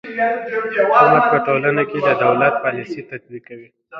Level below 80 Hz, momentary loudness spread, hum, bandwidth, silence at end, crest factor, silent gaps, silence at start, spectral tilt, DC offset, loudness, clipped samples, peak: -62 dBFS; 20 LU; none; 6.8 kHz; 0 s; 16 dB; none; 0.05 s; -7.5 dB/octave; under 0.1%; -16 LUFS; under 0.1%; 0 dBFS